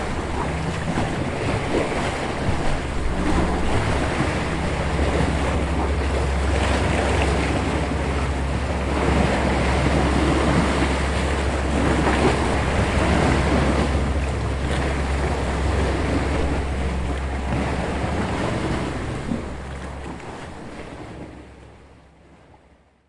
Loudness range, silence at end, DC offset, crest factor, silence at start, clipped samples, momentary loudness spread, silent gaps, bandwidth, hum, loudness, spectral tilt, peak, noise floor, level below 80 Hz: 7 LU; 1.3 s; under 0.1%; 16 dB; 0 s; under 0.1%; 9 LU; none; 11.5 kHz; none; -22 LUFS; -6 dB/octave; -6 dBFS; -55 dBFS; -28 dBFS